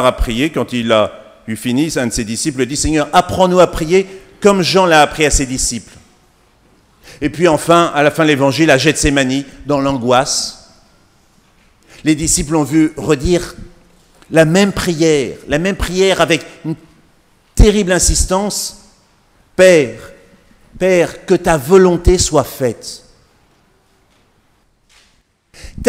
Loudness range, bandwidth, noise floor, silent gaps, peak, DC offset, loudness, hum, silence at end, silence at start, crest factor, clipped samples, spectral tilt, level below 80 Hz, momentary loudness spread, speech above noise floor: 4 LU; 16.5 kHz; -56 dBFS; none; 0 dBFS; under 0.1%; -13 LUFS; none; 0 s; 0 s; 14 dB; 0.2%; -4 dB/octave; -26 dBFS; 12 LU; 43 dB